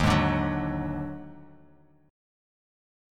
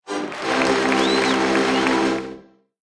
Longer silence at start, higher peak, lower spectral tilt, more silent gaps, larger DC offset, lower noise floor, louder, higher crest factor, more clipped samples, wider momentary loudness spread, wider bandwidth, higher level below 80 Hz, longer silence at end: about the same, 0 s vs 0.05 s; second, -10 dBFS vs -6 dBFS; first, -6.5 dB/octave vs -3.5 dB/octave; neither; neither; first, -58 dBFS vs -44 dBFS; second, -28 LUFS vs -19 LUFS; about the same, 20 dB vs 16 dB; neither; first, 18 LU vs 9 LU; first, 13.5 kHz vs 11 kHz; first, -42 dBFS vs -52 dBFS; first, 1.65 s vs 0.45 s